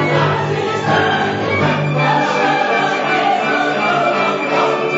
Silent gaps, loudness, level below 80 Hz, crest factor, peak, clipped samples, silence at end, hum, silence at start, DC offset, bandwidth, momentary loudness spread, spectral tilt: none; -15 LUFS; -56 dBFS; 14 dB; -2 dBFS; under 0.1%; 0 s; none; 0 s; under 0.1%; 8 kHz; 2 LU; -5.5 dB/octave